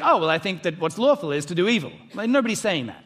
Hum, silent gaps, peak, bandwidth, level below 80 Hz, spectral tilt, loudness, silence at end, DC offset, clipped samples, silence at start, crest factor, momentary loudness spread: none; none; -6 dBFS; 15 kHz; -68 dBFS; -4.5 dB/octave; -22 LUFS; 0.05 s; under 0.1%; under 0.1%; 0 s; 18 dB; 6 LU